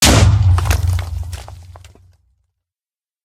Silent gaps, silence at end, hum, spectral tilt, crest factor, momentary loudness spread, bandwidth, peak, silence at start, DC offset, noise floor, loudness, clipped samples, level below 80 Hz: none; 1.45 s; none; -4 dB/octave; 16 dB; 20 LU; 16 kHz; 0 dBFS; 0 s; under 0.1%; under -90 dBFS; -15 LUFS; under 0.1%; -24 dBFS